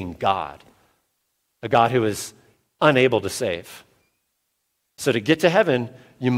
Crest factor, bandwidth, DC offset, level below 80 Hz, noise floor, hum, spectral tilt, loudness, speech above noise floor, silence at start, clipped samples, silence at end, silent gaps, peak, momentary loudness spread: 22 dB; 16.5 kHz; under 0.1%; -58 dBFS; -74 dBFS; none; -5 dB/octave; -21 LUFS; 54 dB; 0 s; under 0.1%; 0 s; none; -2 dBFS; 18 LU